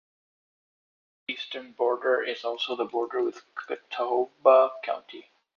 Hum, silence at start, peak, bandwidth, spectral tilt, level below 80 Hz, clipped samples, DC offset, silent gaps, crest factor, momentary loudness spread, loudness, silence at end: none; 1.3 s; -6 dBFS; 7 kHz; -3.5 dB/octave; -80 dBFS; under 0.1%; under 0.1%; none; 22 dB; 16 LU; -27 LUFS; 0.35 s